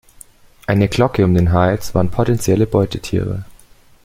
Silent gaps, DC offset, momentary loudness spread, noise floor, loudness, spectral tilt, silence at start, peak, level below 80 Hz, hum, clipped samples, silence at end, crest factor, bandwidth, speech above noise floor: none; under 0.1%; 7 LU; -46 dBFS; -16 LUFS; -7 dB/octave; 0.7 s; 0 dBFS; -36 dBFS; none; under 0.1%; 0.55 s; 16 dB; 16 kHz; 31 dB